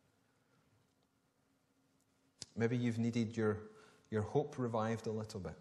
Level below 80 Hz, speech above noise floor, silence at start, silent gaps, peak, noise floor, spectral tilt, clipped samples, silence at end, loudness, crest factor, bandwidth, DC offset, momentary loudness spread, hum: -72 dBFS; 40 dB; 2.55 s; none; -22 dBFS; -78 dBFS; -7 dB/octave; under 0.1%; 0 s; -39 LUFS; 20 dB; 12 kHz; under 0.1%; 10 LU; none